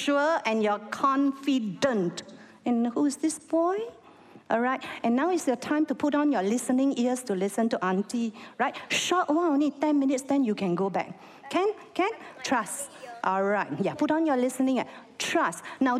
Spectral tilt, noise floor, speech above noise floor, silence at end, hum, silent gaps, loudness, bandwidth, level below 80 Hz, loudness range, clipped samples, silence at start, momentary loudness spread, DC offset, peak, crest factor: -4.5 dB/octave; -52 dBFS; 26 dB; 0 s; none; none; -27 LUFS; 14.5 kHz; -74 dBFS; 2 LU; under 0.1%; 0 s; 7 LU; under 0.1%; -10 dBFS; 16 dB